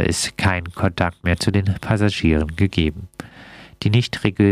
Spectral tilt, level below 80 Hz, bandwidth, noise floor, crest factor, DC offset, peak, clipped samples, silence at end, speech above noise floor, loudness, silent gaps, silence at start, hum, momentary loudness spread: -5.5 dB/octave; -34 dBFS; 14.5 kHz; -42 dBFS; 18 dB; under 0.1%; -2 dBFS; under 0.1%; 0 s; 23 dB; -20 LUFS; none; 0 s; none; 18 LU